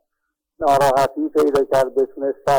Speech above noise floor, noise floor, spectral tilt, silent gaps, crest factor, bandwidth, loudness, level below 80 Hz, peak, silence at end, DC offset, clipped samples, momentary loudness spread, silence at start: 61 dB; -78 dBFS; -5 dB/octave; none; 12 dB; over 20 kHz; -18 LUFS; -50 dBFS; -6 dBFS; 0 s; under 0.1%; under 0.1%; 7 LU; 0.6 s